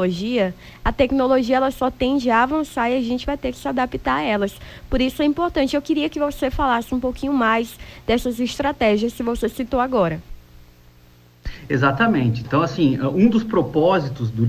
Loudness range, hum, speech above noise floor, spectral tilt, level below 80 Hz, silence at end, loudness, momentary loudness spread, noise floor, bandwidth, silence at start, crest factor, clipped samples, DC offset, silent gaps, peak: 3 LU; 60 Hz at -50 dBFS; 30 dB; -6.5 dB/octave; -38 dBFS; 0 s; -20 LUFS; 8 LU; -50 dBFS; 16 kHz; 0 s; 16 dB; under 0.1%; under 0.1%; none; -4 dBFS